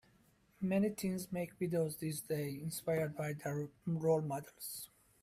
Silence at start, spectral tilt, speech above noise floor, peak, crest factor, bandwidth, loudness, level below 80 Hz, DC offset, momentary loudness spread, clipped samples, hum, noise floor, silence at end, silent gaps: 0.6 s; -6 dB/octave; 32 dB; -22 dBFS; 16 dB; 16 kHz; -39 LUFS; -72 dBFS; under 0.1%; 10 LU; under 0.1%; none; -70 dBFS; 0.35 s; none